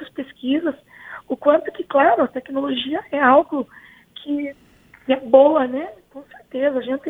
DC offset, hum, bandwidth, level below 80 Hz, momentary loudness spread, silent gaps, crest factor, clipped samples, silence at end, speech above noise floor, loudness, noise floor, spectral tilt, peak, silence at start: under 0.1%; none; 4 kHz; -62 dBFS; 19 LU; none; 20 dB; under 0.1%; 0 s; 33 dB; -19 LUFS; -51 dBFS; -6.5 dB/octave; 0 dBFS; 0 s